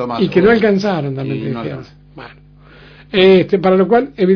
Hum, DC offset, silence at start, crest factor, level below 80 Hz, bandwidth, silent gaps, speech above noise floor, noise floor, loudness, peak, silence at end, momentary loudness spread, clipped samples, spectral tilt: 50 Hz at -45 dBFS; under 0.1%; 0 s; 14 dB; -46 dBFS; 5.4 kHz; none; 28 dB; -41 dBFS; -13 LUFS; 0 dBFS; 0 s; 13 LU; under 0.1%; -7.5 dB/octave